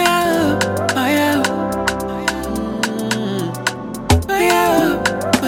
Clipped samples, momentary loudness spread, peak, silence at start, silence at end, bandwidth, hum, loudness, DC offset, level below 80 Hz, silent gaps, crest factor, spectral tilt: under 0.1%; 8 LU; 0 dBFS; 0 s; 0 s; 17 kHz; none; -17 LUFS; under 0.1%; -34 dBFS; none; 16 dB; -4.5 dB/octave